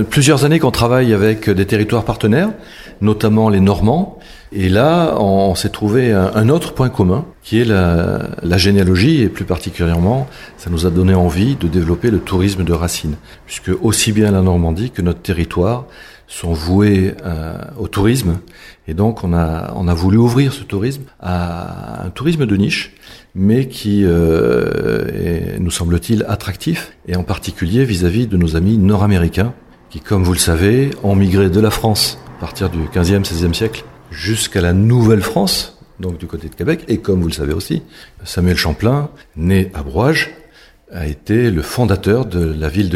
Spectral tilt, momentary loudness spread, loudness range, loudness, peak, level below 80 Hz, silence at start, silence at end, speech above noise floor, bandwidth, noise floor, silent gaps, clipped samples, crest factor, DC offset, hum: -6 dB/octave; 12 LU; 4 LU; -15 LUFS; 0 dBFS; -30 dBFS; 0 s; 0 s; 30 dB; 15.5 kHz; -44 dBFS; none; under 0.1%; 14 dB; under 0.1%; none